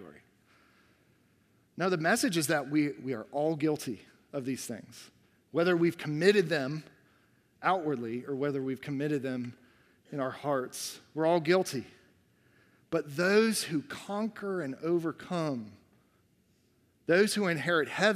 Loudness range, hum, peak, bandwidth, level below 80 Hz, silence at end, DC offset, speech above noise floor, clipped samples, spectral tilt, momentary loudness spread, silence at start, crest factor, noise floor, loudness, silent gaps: 4 LU; none; -10 dBFS; 15.5 kHz; -76 dBFS; 0 s; under 0.1%; 39 dB; under 0.1%; -5 dB/octave; 14 LU; 0 s; 22 dB; -69 dBFS; -31 LUFS; none